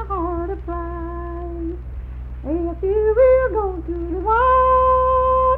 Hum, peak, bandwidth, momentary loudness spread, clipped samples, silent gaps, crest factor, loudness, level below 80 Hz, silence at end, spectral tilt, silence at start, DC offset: none; -6 dBFS; 3.8 kHz; 15 LU; under 0.1%; none; 14 dB; -19 LUFS; -30 dBFS; 0 s; -10.5 dB/octave; 0 s; under 0.1%